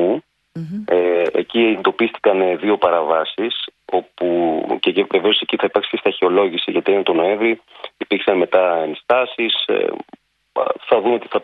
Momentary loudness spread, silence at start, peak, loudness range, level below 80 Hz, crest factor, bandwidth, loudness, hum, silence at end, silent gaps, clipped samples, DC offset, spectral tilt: 9 LU; 0 s; 0 dBFS; 1 LU; -64 dBFS; 18 dB; 4.9 kHz; -18 LUFS; none; 0 s; none; under 0.1%; under 0.1%; -7 dB/octave